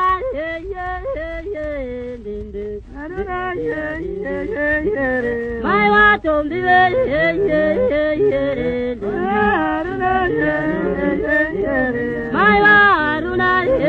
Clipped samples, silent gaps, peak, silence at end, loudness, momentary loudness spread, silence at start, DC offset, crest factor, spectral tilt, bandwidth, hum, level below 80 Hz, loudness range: under 0.1%; none; -2 dBFS; 0 s; -17 LUFS; 14 LU; 0 s; under 0.1%; 16 dB; -7.5 dB/octave; 7.2 kHz; none; -36 dBFS; 10 LU